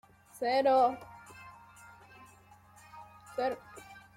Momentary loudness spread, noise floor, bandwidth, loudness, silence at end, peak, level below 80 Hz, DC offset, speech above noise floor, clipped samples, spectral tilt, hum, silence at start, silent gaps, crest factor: 27 LU; -59 dBFS; 15.5 kHz; -30 LUFS; 0.2 s; -16 dBFS; -72 dBFS; under 0.1%; 30 dB; under 0.1%; -4.5 dB/octave; none; 0.35 s; none; 18 dB